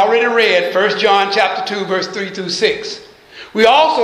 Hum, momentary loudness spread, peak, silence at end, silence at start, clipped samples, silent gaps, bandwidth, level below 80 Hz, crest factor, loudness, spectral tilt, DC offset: none; 12 LU; 0 dBFS; 0 s; 0 s; under 0.1%; none; 13.5 kHz; -58 dBFS; 14 dB; -14 LUFS; -3 dB/octave; under 0.1%